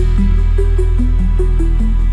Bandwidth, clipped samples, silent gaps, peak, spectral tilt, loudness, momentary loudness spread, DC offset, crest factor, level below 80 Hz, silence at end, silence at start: 4.2 kHz; under 0.1%; none; -4 dBFS; -8.5 dB/octave; -16 LUFS; 1 LU; under 0.1%; 8 dB; -12 dBFS; 0 s; 0 s